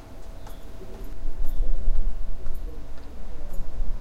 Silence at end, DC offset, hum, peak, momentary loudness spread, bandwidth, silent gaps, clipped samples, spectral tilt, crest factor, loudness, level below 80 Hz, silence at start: 0 s; under 0.1%; none; -6 dBFS; 12 LU; 1.9 kHz; none; under 0.1%; -7 dB/octave; 12 dB; -37 LUFS; -26 dBFS; 0 s